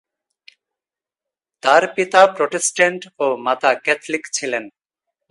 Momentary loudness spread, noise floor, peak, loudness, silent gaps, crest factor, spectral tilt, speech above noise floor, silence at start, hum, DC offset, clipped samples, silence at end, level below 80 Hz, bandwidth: 9 LU; -89 dBFS; 0 dBFS; -17 LUFS; none; 20 dB; -2 dB/octave; 72 dB; 1.65 s; none; under 0.1%; under 0.1%; 0.6 s; -74 dBFS; 11.5 kHz